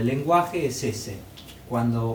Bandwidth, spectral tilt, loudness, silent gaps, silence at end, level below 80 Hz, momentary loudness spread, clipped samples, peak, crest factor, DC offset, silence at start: over 20 kHz; -6 dB/octave; -25 LUFS; none; 0 s; -52 dBFS; 19 LU; under 0.1%; -8 dBFS; 18 dB; under 0.1%; 0 s